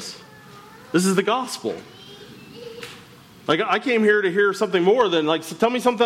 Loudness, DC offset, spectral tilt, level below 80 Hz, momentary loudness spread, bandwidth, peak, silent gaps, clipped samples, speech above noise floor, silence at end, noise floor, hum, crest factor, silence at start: -20 LUFS; under 0.1%; -4.5 dB/octave; -66 dBFS; 23 LU; 16 kHz; -6 dBFS; none; under 0.1%; 26 dB; 0 s; -46 dBFS; none; 16 dB; 0 s